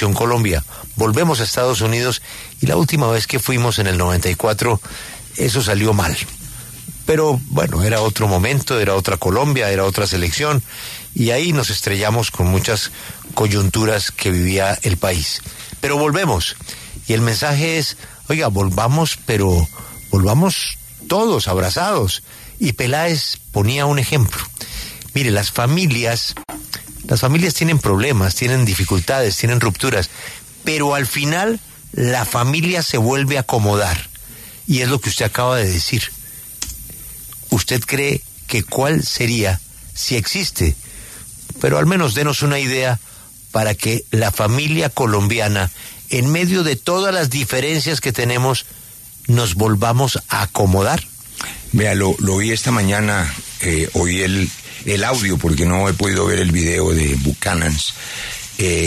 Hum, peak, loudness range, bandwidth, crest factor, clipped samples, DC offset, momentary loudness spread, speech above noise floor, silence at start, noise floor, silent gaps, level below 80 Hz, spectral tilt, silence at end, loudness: none; -2 dBFS; 2 LU; 14 kHz; 16 dB; under 0.1%; under 0.1%; 12 LU; 21 dB; 0 s; -38 dBFS; none; -34 dBFS; -4.5 dB/octave; 0 s; -17 LUFS